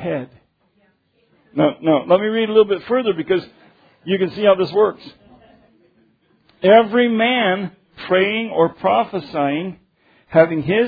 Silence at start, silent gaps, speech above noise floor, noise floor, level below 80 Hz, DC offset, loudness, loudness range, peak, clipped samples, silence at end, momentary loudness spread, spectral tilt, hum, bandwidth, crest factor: 0 s; none; 45 dB; -61 dBFS; -60 dBFS; under 0.1%; -17 LUFS; 4 LU; 0 dBFS; under 0.1%; 0 s; 12 LU; -8.5 dB/octave; none; 5 kHz; 18 dB